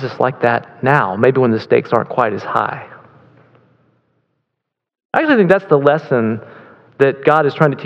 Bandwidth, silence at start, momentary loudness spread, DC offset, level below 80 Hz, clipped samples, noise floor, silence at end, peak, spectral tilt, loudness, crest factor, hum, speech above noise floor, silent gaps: 7.6 kHz; 0 s; 7 LU; under 0.1%; -64 dBFS; 0.1%; -78 dBFS; 0 s; 0 dBFS; -8.5 dB/octave; -15 LUFS; 16 dB; none; 64 dB; 5.05-5.09 s